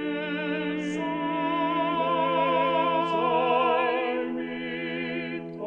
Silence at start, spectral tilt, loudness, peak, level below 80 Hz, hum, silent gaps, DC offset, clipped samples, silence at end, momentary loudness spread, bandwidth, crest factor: 0 s; -6 dB/octave; -26 LUFS; -12 dBFS; -68 dBFS; none; none; under 0.1%; under 0.1%; 0 s; 8 LU; 8.8 kHz; 14 dB